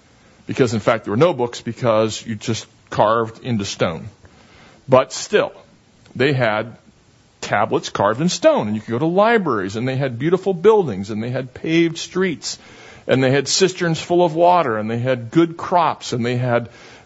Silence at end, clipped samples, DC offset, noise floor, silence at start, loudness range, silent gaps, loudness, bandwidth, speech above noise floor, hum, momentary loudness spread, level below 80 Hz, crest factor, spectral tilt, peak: 0.1 s; under 0.1%; under 0.1%; -53 dBFS; 0.5 s; 4 LU; none; -19 LUFS; 8 kHz; 35 dB; none; 11 LU; -56 dBFS; 18 dB; -5 dB/octave; 0 dBFS